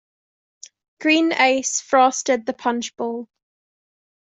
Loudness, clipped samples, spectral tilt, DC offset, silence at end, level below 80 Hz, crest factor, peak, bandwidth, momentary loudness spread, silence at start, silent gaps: -19 LUFS; under 0.1%; -1 dB/octave; under 0.1%; 1.05 s; -72 dBFS; 20 dB; -2 dBFS; 8.2 kHz; 11 LU; 1 s; none